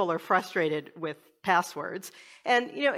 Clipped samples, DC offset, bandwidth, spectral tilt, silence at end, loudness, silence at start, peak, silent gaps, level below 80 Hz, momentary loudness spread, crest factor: under 0.1%; under 0.1%; 16 kHz; -4 dB/octave; 0 s; -29 LUFS; 0 s; -10 dBFS; none; -80 dBFS; 12 LU; 20 dB